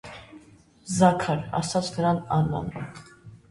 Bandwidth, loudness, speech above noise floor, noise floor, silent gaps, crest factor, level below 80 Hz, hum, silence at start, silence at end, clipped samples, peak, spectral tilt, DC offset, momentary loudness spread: 11.5 kHz; -25 LUFS; 29 dB; -53 dBFS; none; 22 dB; -52 dBFS; none; 0.05 s; 0.15 s; under 0.1%; -4 dBFS; -6 dB/octave; under 0.1%; 23 LU